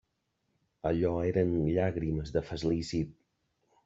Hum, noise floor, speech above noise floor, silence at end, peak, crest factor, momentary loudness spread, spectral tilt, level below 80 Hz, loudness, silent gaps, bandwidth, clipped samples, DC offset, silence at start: none; -79 dBFS; 49 dB; 0.75 s; -14 dBFS; 18 dB; 7 LU; -7.5 dB/octave; -50 dBFS; -31 LUFS; none; 8 kHz; under 0.1%; under 0.1%; 0.85 s